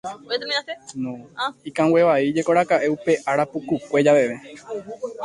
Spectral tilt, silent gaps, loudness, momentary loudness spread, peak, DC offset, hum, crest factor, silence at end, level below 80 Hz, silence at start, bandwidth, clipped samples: -5 dB/octave; none; -21 LUFS; 16 LU; -4 dBFS; under 0.1%; none; 18 dB; 0 s; -64 dBFS; 0.05 s; 11.5 kHz; under 0.1%